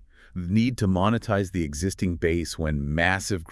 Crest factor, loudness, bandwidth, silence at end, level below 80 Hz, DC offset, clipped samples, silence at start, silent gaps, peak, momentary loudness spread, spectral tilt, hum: 20 dB; -25 LUFS; 12 kHz; 0 s; -42 dBFS; under 0.1%; under 0.1%; 0.35 s; none; -6 dBFS; 5 LU; -5.5 dB/octave; none